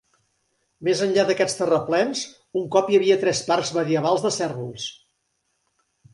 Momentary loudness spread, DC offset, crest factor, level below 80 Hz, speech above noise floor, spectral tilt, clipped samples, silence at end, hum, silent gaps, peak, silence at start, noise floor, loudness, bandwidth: 11 LU; under 0.1%; 20 dB; -66 dBFS; 51 dB; -4 dB/octave; under 0.1%; 1.2 s; none; none; -4 dBFS; 0.8 s; -73 dBFS; -22 LUFS; 11.5 kHz